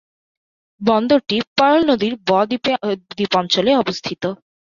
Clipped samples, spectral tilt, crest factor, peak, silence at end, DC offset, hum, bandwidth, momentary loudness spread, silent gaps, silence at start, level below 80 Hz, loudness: under 0.1%; -5 dB/octave; 16 dB; -2 dBFS; 0.35 s; under 0.1%; none; 7.4 kHz; 9 LU; 1.47-1.56 s; 0.8 s; -56 dBFS; -18 LUFS